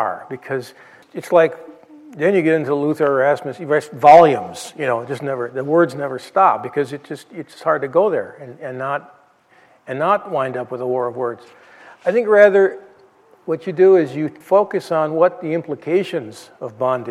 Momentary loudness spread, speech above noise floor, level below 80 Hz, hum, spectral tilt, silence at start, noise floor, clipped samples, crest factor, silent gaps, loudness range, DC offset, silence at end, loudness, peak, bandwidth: 19 LU; 36 dB; -70 dBFS; none; -6.5 dB/octave; 0 s; -53 dBFS; under 0.1%; 18 dB; none; 8 LU; under 0.1%; 0 s; -17 LUFS; 0 dBFS; 13 kHz